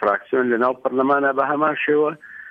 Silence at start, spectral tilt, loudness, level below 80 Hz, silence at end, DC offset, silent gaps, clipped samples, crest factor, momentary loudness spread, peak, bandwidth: 0 s; -8 dB/octave; -19 LUFS; -68 dBFS; 0 s; under 0.1%; none; under 0.1%; 14 dB; 3 LU; -6 dBFS; 5 kHz